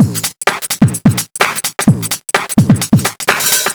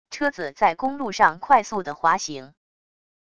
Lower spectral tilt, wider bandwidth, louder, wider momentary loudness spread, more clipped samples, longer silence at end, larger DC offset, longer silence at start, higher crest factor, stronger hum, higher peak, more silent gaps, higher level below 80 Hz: about the same, -4 dB/octave vs -3.5 dB/octave; first, over 20 kHz vs 10 kHz; first, -13 LUFS vs -22 LUFS; second, 5 LU vs 9 LU; neither; second, 0 s vs 0.8 s; second, under 0.1% vs 0.4%; about the same, 0 s vs 0.1 s; second, 12 dB vs 22 dB; neither; about the same, 0 dBFS vs -2 dBFS; neither; first, -44 dBFS vs -60 dBFS